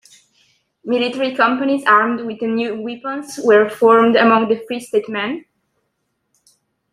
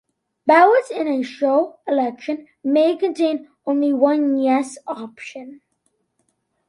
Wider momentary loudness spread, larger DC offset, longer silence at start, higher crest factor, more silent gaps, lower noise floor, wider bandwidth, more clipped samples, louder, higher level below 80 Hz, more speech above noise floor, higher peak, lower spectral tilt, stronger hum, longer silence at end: second, 13 LU vs 16 LU; neither; first, 0.85 s vs 0.45 s; about the same, 16 dB vs 18 dB; neither; about the same, -71 dBFS vs -69 dBFS; first, 13 kHz vs 11.5 kHz; neither; first, -16 LUFS vs -19 LUFS; first, -66 dBFS vs -74 dBFS; first, 55 dB vs 51 dB; about the same, 0 dBFS vs -2 dBFS; about the same, -5 dB/octave vs -4.5 dB/octave; neither; first, 1.55 s vs 1.15 s